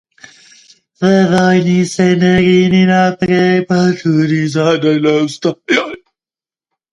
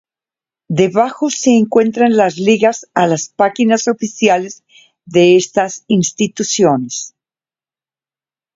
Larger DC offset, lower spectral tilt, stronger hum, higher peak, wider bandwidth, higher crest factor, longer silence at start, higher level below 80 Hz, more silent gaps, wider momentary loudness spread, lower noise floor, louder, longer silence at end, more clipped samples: neither; first, -6.5 dB/octave vs -4.5 dB/octave; neither; about the same, 0 dBFS vs 0 dBFS; first, 10.5 kHz vs 7.8 kHz; about the same, 12 dB vs 14 dB; first, 1 s vs 0.7 s; first, -48 dBFS vs -60 dBFS; neither; about the same, 5 LU vs 7 LU; about the same, under -90 dBFS vs under -90 dBFS; about the same, -12 LUFS vs -14 LUFS; second, 0.95 s vs 1.5 s; neither